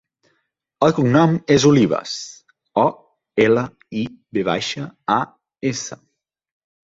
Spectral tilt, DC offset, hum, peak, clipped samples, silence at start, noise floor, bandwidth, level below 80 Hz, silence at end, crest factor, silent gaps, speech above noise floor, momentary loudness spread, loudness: -5.5 dB/octave; under 0.1%; none; -2 dBFS; under 0.1%; 0.8 s; -70 dBFS; 7.8 kHz; -56 dBFS; 0.9 s; 18 dB; none; 53 dB; 13 LU; -19 LUFS